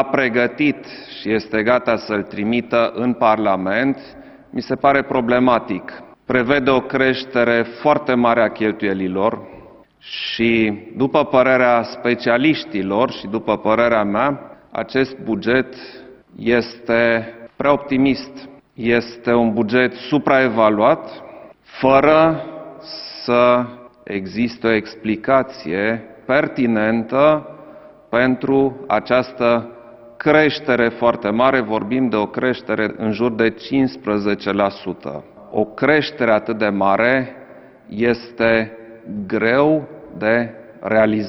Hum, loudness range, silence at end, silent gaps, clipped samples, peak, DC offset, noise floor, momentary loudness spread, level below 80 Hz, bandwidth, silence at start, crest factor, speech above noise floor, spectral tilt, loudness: none; 3 LU; 0 s; none; under 0.1%; 0 dBFS; under 0.1%; -42 dBFS; 14 LU; -50 dBFS; 6 kHz; 0 s; 18 dB; 25 dB; -7.5 dB/octave; -18 LUFS